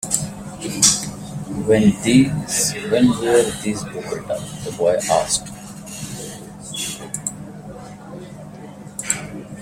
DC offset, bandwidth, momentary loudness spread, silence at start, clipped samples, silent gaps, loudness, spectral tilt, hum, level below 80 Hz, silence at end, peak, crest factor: under 0.1%; 16.5 kHz; 21 LU; 0 s; under 0.1%; none; -19 LUFS; -4 dB/octave; none; -48 dBFS; 0 s; 0 dBFS; 20 dB